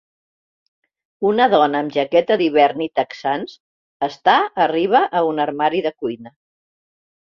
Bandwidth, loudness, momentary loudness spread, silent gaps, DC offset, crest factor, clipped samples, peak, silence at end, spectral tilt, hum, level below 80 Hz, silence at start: 7 kHz; -18 LUFS; 11 LU; 3.60-4.00 s; under 0.1%; 18 dB; under 0.1%; -2 dBFS; 1 s; -6 dB/octave; none; -64 dBFS; 1.2 s